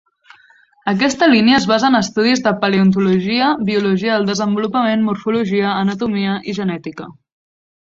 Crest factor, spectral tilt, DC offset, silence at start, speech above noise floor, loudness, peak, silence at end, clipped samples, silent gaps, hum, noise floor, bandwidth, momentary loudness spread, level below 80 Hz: 14 dB; -5.5 dB/octave; under 0.1%; 0.85 s; 36 dB; -15 LUFS; -2 dBFS; 0.8 s; under 0.1%; none; none; -51 dBFS; 7.8 kHz; 9 LU; -56 dBFS